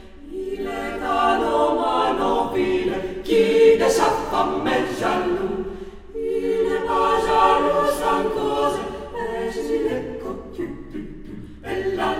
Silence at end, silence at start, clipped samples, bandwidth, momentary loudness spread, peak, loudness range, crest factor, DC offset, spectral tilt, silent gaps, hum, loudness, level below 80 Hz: 0 s; 0 s; under 0.1%; 15.5 kHz; 15 LU; -4 dBFS; 7 LU; 16 dB; under 0.1%; -4.5 dB/octave; none; none; -21 LUFS; -42 dBFS